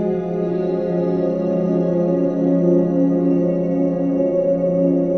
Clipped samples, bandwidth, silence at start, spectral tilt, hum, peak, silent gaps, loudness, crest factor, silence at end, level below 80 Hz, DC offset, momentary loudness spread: under 0.1%; 6.2 kHz; 0 s; -11 dB/octave; none; -6 dBFS; none; -18 LUFS; 12 dB; 0 s; -54 dBFS; 0.2%; 4 LU